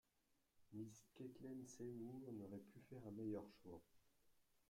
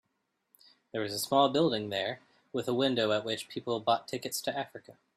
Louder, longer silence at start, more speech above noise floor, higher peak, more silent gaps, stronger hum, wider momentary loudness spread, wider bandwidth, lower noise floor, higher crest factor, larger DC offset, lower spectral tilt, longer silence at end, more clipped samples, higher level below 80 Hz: second, -56 LUFS vs -31 LUFS; second, 0.55 s vs 0.95 s; second, 29 dB vs 49 dB; second, -40 dBFS vs -12 dBFS; neither; neither; second, 10 LU vs 13 LU; about the same, 16 kHz vs 15.5 kHz; first, -85 dBFS vs -80 dBFS; about the same, 18 dB vs 20 dB; neither; first, -7 dB/octave vs -4 dB/octave; second, 0.1 s vs 0.25 s; neither; second, -84 dBFS vs -74 dBFS